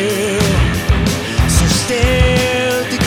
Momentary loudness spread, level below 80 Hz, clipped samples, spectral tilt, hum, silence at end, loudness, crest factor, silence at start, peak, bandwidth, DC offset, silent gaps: 4 LU; -20 dBFS; under 0.1%; -4.5 dB/octave; none; 0 s; -14 LUFS; 14 dB; 0 s; 0 dBFS; 17.5 kHz; under 0.1%; none